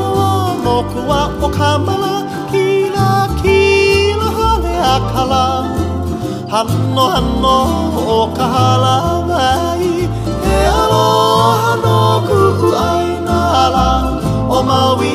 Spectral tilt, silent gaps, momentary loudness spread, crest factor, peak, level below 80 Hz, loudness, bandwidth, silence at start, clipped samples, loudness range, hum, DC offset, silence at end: -5.5 dB/octave; none; 6 LU; 12 dB; 0 dBFS; -26 dBFS; -13 LUFS; 15.5 kHz; 0 s; under 0.1%; 3 LU; none; 0.1%; 0 s